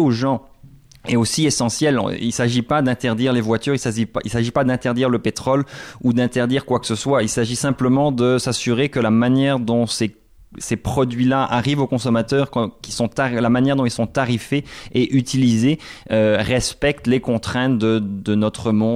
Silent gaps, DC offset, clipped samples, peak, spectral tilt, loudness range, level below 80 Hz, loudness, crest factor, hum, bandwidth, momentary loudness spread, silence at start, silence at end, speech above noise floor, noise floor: none; under 0.1%; under 0.1%; -6 dBFS; -5.5 dB/octave; 2 LU; -46 dBFS; -19 LUFS; 12 dB; none; 15 kHz; 6 LU; 0 s; 0 s; 27 dB; -46 dBFS